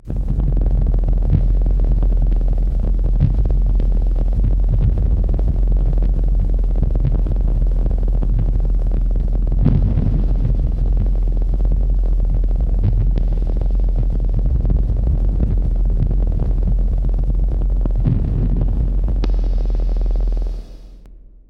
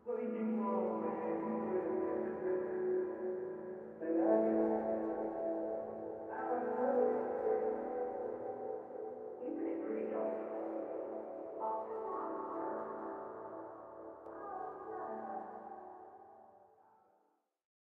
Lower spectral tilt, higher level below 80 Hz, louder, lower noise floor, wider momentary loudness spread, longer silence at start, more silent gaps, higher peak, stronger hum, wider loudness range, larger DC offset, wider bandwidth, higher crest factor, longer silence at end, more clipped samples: about the same, -10.5 dB/octave vs -10 dB/octave; first, -16 dBFS vs -78 dBFS; first, -20 LUFS vs -39 LUFS; second, -40 dBFS vs -78 dBFS; second, 3 LU vs 14 LU; about the same, 0.05 s vs 0.05 s; neither; first, -2 dBFS vs -20 dBFS; neither; second, 1 LU vs 11 LU; neither; second, 1.6 kHz vs 3.3 kHz; second, 14 dB vs 20 dB; second, 0.3 s vs 1.3 s; neither